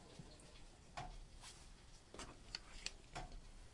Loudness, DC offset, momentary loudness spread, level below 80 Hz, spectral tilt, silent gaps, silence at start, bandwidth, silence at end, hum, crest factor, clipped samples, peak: -55 LUFS; under 0.1%; 11 LU; -60 dBFS; -2.5 dB/octave; none; 0 s; 11.5 kHz; 0 s; none; 28 dB; under 0.1%; -26 dBFS